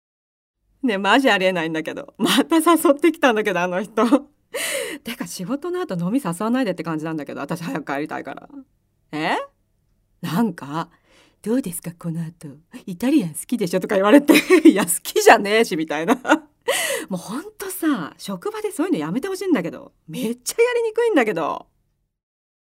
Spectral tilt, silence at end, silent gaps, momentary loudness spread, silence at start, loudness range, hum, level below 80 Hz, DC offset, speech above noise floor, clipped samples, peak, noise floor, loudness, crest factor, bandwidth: -4 dB/octave; 1.2 s; none; 16 LU; 0.85 s; 11 LU; none; -64 dBFS; under 0.1%; 49 dB; under 0.1%; 0 dBFS; -69 dBFS; -20 LUFS; 20 dB; 16 kHz